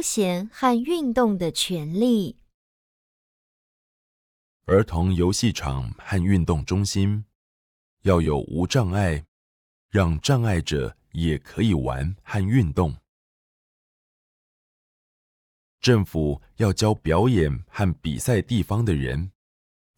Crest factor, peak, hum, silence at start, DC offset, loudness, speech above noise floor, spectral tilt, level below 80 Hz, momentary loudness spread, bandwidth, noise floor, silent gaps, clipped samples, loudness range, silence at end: 18 dB; -6 dBFS; none; 0 s; under 0.1%; -23 LUFS; over 68 dB; -6 dB/octave; -42 dBFS; 7 LU; 18.5 kHz; under -90 dBFS; 2.54-4.60 s, 7.35-7.97 s, 9.28-9.89 s, 13.08-15.78 s; under 0.1%; 5 LU; 0.7 s